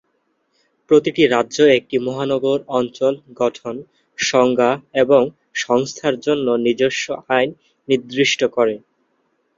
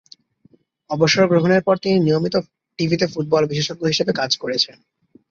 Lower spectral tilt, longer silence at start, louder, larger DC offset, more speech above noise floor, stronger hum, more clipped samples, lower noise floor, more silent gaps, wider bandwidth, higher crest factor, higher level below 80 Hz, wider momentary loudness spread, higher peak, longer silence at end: about the same, -4 dB/octave vs -5 dB/octave; about the same, 0.9 s vs 0.9 s; about the same, -18 LUFS vs -19 LUFS; neither; first, 50 dB vs 38 dB; neither; neither; first, -67 dBFS vs -57 dBFS; neither; about the same, 7.6 kHz vs 7.6 kHz; about the same, 18 dB vs 18 dB; about the same, -62 dBFS vs -58 dBFS; about the same, 9 LU vs 8 LU; about the same, -2 dBFS vs -2 dBFS; first, 0.8 s vs 0.6 s